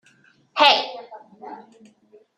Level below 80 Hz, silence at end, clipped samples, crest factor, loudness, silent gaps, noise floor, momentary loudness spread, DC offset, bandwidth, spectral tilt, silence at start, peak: -78 dBFS; 0.8 s; under 0.1%; 24 dB; -17 LUFS; none; -58 dBFS; 25 LU; under 0.1%; 14 kHz; -1 dB/octave; 0.55 s; 0 dBFS